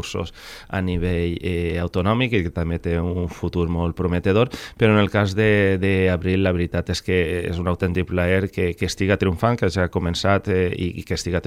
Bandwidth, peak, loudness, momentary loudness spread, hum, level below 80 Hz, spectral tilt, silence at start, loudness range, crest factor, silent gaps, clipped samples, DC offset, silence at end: 14.5 kHz; -4 dBFS; -21 LUFS; 8 LU; none; -38 dBFS; -6.5 dB/octave; 0 s; 3 LU; 16 dB; none; under 0.1%; under 0.1%; 0 s